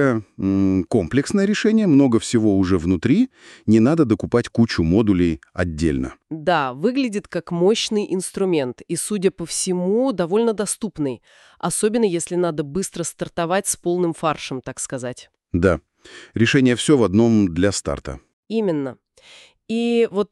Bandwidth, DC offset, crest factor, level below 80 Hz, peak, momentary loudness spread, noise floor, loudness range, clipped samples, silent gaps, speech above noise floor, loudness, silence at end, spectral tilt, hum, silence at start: 13.5 kHz; under 0.1%; 16 dB; -44 dBFS; -4 dBFS; 11 LU; -48 dBFS; 5 LU; under 0.1%; 18.33-18.43 s; 29 dB; -20 LUFS; 0.05 s; -5.5 dB/octave; none; 0 s